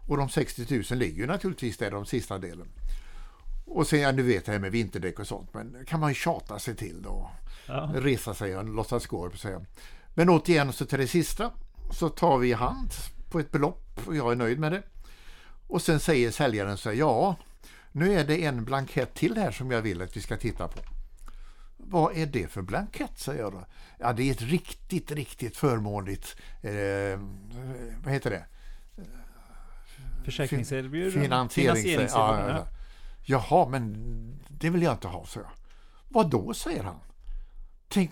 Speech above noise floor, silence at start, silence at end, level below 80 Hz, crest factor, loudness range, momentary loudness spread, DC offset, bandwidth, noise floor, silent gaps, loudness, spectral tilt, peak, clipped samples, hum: 21 dB; 0 s; 0 s; -40 dBFS; 22 dB; 6 LU; 18 LU; under 0.1%; 19 kHz; -48 dBFS; none; -29 LUFS; -6 dB/octave; -8 dBFS; under 0.1%; none